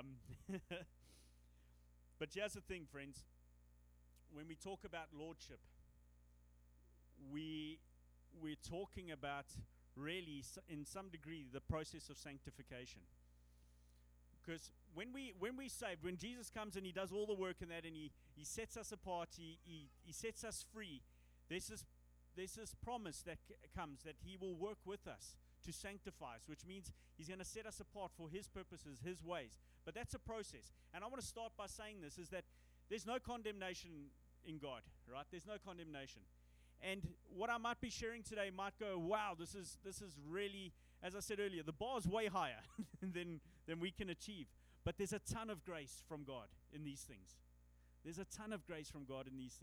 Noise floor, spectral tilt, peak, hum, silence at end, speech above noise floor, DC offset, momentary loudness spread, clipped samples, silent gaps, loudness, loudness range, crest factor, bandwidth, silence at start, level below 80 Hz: -70 dBFS; -4 dB/octave; -28 dBFS; 60 Hz at -70 dBFS; 0 s; 19 dB; under 0.1%; 13 LU; under 0.1%; none; -50 LUFS; 8 LU; 24 dB; over 20 kHz; 0 s; -66 dBFS